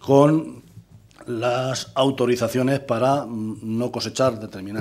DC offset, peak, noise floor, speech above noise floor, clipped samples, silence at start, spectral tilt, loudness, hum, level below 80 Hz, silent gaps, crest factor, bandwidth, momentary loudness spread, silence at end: under 0.1%; -2 dBFS; -47 dBFS; 26 dB; under 0.1%; 0 s; -6 dB/octave; -22 LUFS; none; -60 dBFS; none; 20 dB; 15 kHz; 13 LU; 0 s